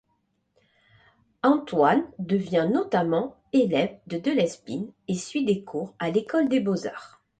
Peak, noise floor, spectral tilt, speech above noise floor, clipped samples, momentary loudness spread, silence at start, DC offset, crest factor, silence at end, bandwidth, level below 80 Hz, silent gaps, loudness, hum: -8 dBFS; -72 dBFS; -6 dB/octave; 48 dB; under 0.1%; 10 LU; 1.45 s; under 0.1%; 18 dB; 0.3 s; 9.2 kHz; -66 dBFS; none; -25 LUFS; none